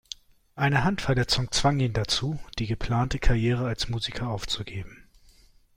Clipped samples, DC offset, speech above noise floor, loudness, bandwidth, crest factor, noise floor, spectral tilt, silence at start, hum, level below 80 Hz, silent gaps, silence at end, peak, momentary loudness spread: under 0.1%; under 0.1%; 31 dB; -26 LUFS; 15.5 kHz; 20 dB; -57 dBFS; -5 dB/octave; 0.55 s; none; -36 dBFS; none; 0.8 s; -8 dBFS; 11 LU